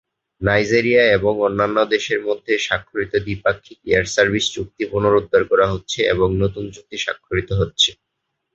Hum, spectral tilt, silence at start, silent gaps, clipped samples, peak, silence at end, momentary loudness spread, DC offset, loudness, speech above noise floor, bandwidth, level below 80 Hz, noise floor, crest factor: none; -4.5 dB/octave; 0.4 s; none; under 0.1%; 0 dBFS; 0.6 s; 9 LU; under 0.1%; -18 LUFS; 57 dB; 8 kHz; -40 dBFS; -76 dBFS; 18 dB